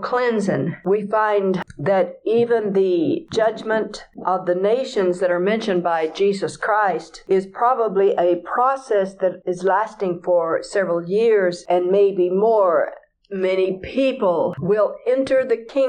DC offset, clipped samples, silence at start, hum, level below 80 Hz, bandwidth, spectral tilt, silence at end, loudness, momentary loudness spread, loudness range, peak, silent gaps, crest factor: under 0.1%; under 0.1%; 0 s; none; -58 dBFS; 9.8 kHz; -6.5 dB/octave; 0 s; -20 LUFS; 6 LU; 2 LU; -6 dBFS; none; 12 dB